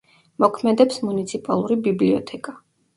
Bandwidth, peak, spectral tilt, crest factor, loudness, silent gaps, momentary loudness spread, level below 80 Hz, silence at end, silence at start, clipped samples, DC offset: 11.5 kHz; -2 dBFS; -6.5 dB/octave; 20 dB; -20 LUFS; none; 13 LU; -64 dBFS; 0.4 s; 0.4 s; under 0.1%; under 0.1%